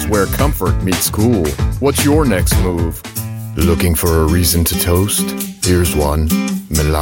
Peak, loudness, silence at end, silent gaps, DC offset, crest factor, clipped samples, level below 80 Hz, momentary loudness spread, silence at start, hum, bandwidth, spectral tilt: 0 dBFS; -15 LUFS; 0 s; none; under 0.1%; 14 dB; under 0.1%; -22 dBFS; 6 LU; 0 s; none; 17 kHz; -5 dB/octave